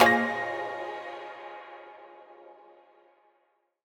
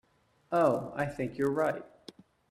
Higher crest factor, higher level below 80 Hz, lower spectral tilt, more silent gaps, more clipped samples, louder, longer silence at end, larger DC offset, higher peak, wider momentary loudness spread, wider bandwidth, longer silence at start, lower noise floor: first, 28 dB vs 20 dB; second, -72 dBFS vs -64 dBFS; second, -3.5 dB/octave vs -7 dB/octave; neither; neither; about the same, -30 LUFS vs -31 LUFS; first, 1.3 s vs 0.65 s; neither; first, -2 dBFS vs -12 dBFS; first, 25 LU vs 10 LU; first, 19.5 kHz vs 14 kHz; second, 0 s vs 0.5 s; first, -72 dBFS vs -55 dBFS